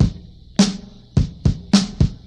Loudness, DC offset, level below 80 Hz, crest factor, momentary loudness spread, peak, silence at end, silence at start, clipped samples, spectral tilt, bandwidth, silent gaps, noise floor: -20 LUFS; under 0.1%; -28 dBFS; 20 dB; 10 LU; 0 dBFS; 0.1 s; 0 s; under 0.1%; -5.5 dB/octave; 11 kHz; none; -38 dBFS